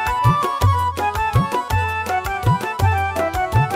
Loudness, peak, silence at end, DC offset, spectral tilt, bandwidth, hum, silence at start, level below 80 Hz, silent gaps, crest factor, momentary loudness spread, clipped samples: -19 LUFS; -4 dBFS; 0 s; under 0.1%; -6 dB/octave; 16 kHz; none; 0 s; -32 dBFS; none; 14 dB; 4 LU; under 0.1%